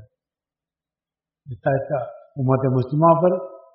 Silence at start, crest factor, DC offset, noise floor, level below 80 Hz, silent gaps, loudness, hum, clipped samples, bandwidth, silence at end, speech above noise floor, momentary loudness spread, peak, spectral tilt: 1.5 s; 18 dB; under 0.1%; under -90 dBFS; -60 dBFS; none; -20 LUFS; none; under 0.1%; 4.6 kHz; 0.15 s; over 71 dB; 12 LU; -4 dBFS; -9.5 dB/octave